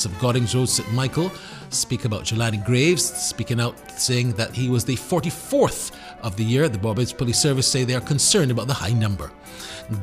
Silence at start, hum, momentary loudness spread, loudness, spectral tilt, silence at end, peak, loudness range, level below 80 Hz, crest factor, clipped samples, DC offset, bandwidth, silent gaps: 0 s; none; 12 LU; -21 LUFS; -4 dB/octave; 0 s; -4 dBFS; 3 LU; -46 dBFS; 18 dB; under 0.1%; under 0.1%; 15.5 kHz; none